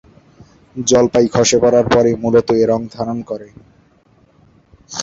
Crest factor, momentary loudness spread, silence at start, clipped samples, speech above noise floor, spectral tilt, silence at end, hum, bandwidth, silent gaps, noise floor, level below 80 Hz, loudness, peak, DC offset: 14 dB; 16 LU; 0.75 s; under 0.1%; 39 dB; -4.5 dB/octave; 0 s; none; 8 kHz; none; -53 dBFS; -46 dBFS; -14 LUFS; -2 dBFS; under 0.1%